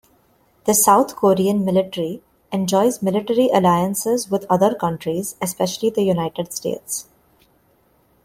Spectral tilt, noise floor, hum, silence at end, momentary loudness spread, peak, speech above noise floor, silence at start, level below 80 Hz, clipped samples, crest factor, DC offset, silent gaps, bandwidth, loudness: -5 dB/octave; -59 dBFS; none; 1.25 s; 11 LU; -2 dBFS; 41 dB; 0.65 s; -58 dBFS; under 0.1%; 18 dB; under 0.1%; none; 16.5 kHz; -19 LUFS